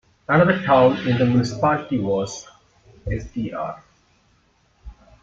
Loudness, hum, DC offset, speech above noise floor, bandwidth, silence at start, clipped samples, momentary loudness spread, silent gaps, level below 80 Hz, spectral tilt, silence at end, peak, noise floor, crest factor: -20 LUFS; none; under 0.1%; 41 dB; 7.8 kHz; 0.3 s; under 0.1%; 15 LU; none; -44 dBFS; -6.5 dB/octave; 0.3 s; -4 dBFS; -61 dBFS; 18 dB